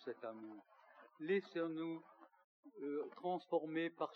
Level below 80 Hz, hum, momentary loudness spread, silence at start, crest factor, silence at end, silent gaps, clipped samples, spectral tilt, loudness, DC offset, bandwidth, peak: under -90 dBFS; none; 20 LU; 0 s; 18 dB; 0 s; 2.44-2.63 s; under 0.1%; -4.5 dB/octave; -44 LUFS; under 0.1%; 6.2 kHz; -26 dBFS